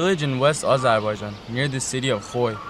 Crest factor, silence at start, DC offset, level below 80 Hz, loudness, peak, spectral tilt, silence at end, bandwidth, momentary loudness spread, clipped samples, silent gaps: 16 dB; 0 s; under 0.1%; -52 dBFS; -22 LUFS; -6 dBFS; -4.5 dB/octave; 0 s; 14 kHz; 8 LU; under 0.1%; none